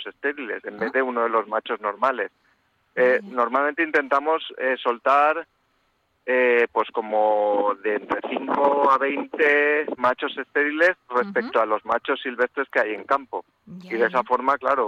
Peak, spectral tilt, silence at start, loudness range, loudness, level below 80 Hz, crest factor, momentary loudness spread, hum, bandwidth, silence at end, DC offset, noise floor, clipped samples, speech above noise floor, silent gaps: -6 dBFS; -5.5 dB/octave; 0 s; 3 LU; -22 LUFS; -70 dBFS; 16 dB; 9 LU; none; 7.6 kHz; 0 s; under 0.1%; -68 dBFS; under 0.1%; 46 dB; none